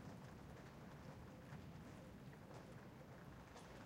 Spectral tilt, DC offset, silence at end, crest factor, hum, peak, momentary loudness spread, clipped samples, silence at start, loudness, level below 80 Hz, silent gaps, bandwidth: -6 dB/octave; under 0.1%; 0 s; 14 dB; none; -44 dBFS; 2 LU; under 0.1%; 0 s; -58 LUFS; -70 dBFS; none; 16 kHz